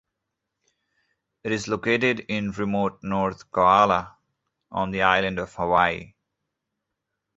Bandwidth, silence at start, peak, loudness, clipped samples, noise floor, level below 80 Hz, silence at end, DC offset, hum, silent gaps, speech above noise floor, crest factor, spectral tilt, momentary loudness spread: 8 kHz; 1.45 s; -2 dBFS; -23 LUFS; under 0.1%; -82 dBFS; -54 dBFS; 1.3 s; under 0.1%; none; none; 59 dB; 22 dB; -5.5 dB/octave; 11 LU